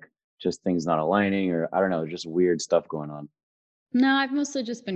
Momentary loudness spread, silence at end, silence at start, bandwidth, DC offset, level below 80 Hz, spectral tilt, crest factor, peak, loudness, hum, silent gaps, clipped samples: 10 LU; 0 s; 0.4 s; 8.8 kHz; under 0.1%; -62 dBFS; -5.5 dB/octave; 18 dB; -8 dBFS; -25 LUFS; none; 3.43-3.86 s; under 0.1%